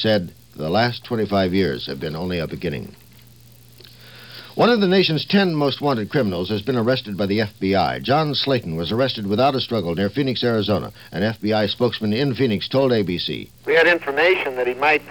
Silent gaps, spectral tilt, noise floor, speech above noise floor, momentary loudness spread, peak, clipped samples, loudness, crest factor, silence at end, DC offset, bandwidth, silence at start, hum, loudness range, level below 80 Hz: none; -6.5 dB/octave; -47 dBFS; 28 dB; 10 LU; -4 dBFS; under 0.1%; -20 LUFS; 18 dB; 0 s; 0.2%; 19.5 kHz; 0 s; none; 5 LU; -52 dBFS